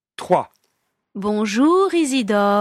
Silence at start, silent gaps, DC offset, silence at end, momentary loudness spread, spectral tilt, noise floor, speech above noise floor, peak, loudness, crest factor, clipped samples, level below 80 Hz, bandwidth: 0.2 s; none; under 0.1%; 0 s; 13 LU; -5 dB/octave; -71 dBFS; 54 dB; -2 dBFS; -18 LUFS; 16 dB; under 0.1%; -60 dBFS; 14.5 kHz